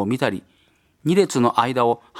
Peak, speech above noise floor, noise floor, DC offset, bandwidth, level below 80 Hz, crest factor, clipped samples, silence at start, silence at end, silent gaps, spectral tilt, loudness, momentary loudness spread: -2 dBFS; 39 dB; -59 dBFS; under 0.1%; 16 kHz; -64 dBFS; 20 dB; under 0.1%; 0 s; 0 s; none; -5.5 dB/octave; -20 LUFS; 9 LU